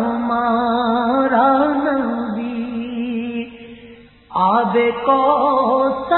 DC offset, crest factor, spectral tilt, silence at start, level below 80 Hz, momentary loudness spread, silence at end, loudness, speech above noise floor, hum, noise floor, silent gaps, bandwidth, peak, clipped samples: under 0.1%; 14 dB; -11 dB/octave; 0 s; -52 dBFS; 10 LU; 0 s; -17 LUFS; 27 dB; none; -42 dBFS; none; 4.3 kHz; -2 dBFS; under 0.1%